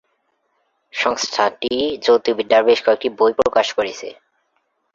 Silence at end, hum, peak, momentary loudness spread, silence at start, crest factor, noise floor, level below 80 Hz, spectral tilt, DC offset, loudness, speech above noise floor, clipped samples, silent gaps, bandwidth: 0.8 s; none; 0 dBFS; 10 LU; 0.95 s; 18 dB; -68 dBFS; -58 dBFS; -2.5 dB/octave; under 0.1%; -17 LUFS; 51 dB; under 0.1%; none; 7.6 kHz